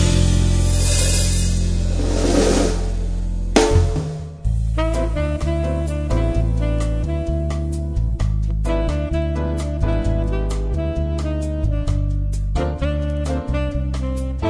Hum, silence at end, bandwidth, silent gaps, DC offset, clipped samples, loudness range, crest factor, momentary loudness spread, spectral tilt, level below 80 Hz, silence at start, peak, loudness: none; 0 s; 11 kHz; none; under 0.1%; under 0.1%; 4 LU; 18 dB; 7 LU; -5.5 dB/octave; -22 dBFS; 0 s; 0 dBFS; -21 LUFS